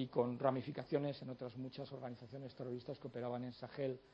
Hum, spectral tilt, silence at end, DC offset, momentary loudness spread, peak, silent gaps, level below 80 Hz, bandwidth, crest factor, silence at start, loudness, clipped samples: none; -9 dB/octave; 0.05 s; under 0.1%; 11 LU; -20 dBFS; none; -78 dBFS; 6.4 kHz; 22 dB; 0 s; -44 LUFS; under 0.1%